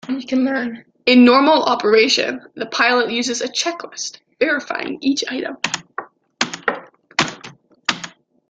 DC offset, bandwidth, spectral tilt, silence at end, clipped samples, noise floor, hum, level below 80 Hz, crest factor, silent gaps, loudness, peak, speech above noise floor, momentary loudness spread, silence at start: under 0.1%; 9.2 kHz; -2.5 dB/octave; 0.4 s; under 0.1%; -42 dBFS; none; -64 dBFS; 18 dB; none; -18 LUFS; 0 dBFS; 25 dB; 15 LU; 0.05 s